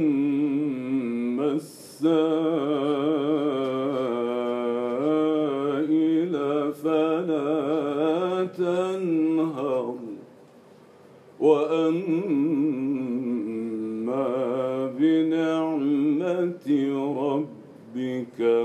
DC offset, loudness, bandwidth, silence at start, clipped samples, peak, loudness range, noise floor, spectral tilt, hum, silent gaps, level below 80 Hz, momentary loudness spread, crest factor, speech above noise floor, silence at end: under 0.1%; -25 LUFS; 12 kHz; 0 s; under 0.1%; -8 dBFS; 2 LU; -51 dBFS; -7.5 dB/octave; none; none; -82 dBFS; 7 LU; 16 dB; 27 dB; 0 s